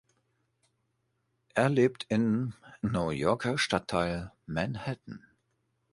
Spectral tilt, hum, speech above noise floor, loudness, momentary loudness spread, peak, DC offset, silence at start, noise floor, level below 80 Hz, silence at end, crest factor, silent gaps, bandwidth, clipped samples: -6 dB/octave; none; 48 dB; -30 LUFS; 11 LU; -10 dBFS; under 0.1%; 1.55 s; -77 dBFS; -56 dBFS; 0.75 s; 22 dB; none; 11.5 kHz; under 0.1%